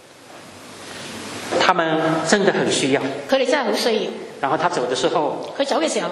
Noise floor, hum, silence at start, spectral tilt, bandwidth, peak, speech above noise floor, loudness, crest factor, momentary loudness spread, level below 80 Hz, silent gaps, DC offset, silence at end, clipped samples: -42 dBFS; none; 0.2 s; -3.5 dB/octave; 13 kHz; 0 dBFS; 22 dB; -20 LUFS; 20 dB; 17 LU; -66 dBFS; none; under 0.1%; 0 s; under 0.1%